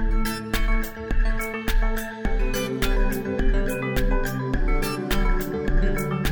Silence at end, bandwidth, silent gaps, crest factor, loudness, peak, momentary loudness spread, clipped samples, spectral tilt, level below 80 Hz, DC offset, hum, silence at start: 0 s; over 20 kHz; none; 12 dB; -26 LUFS; -10 dBFS; 3 LU; under 0.1%; -5.5 dB/octave; -24 dBFS; under 0.1%; none; 0 s